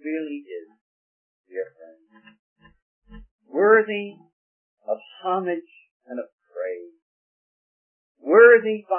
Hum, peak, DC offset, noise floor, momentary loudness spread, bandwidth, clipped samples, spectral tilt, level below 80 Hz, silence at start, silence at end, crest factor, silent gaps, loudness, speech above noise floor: none; -2 dBFS; under 0.1%; -53 dBFS; 24 LU; 3.3 kHz; under 0.1%; -9.5 dB/octave; -62 dBFS; 0.05 s; 0 s; 22 dB; 0.81-1.44 s, 2.39-2.56 s, 2.82-3.02 s, 3.31-3.39 s, 4.33-4.77 s, 5.91-6.00 s, 6.32-6.38 s, 7.02-8.15 s; -20 LUFS; 27 dB